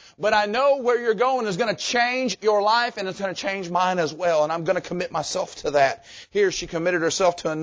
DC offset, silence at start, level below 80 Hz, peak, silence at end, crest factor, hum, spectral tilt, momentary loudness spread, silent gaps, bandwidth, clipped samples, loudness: under 0.1%; 0.2 s; -58 dBFS; -6 dBFS; 0 s; 16 dB; none; -3.5 dB/octave; 7 LU; none; 8 kHz; under 0.1%; -22 LUFS